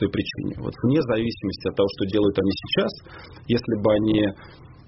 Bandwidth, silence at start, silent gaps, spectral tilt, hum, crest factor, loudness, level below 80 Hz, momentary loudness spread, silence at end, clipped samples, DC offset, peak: 6 kHz; 0 s; none; -5.5 dB/octave; none; 16 dB; -23 LUFS; -48 dBFS; 10 LU; 0.15 s; under 0.1%; under 0.1%; -8 dBFS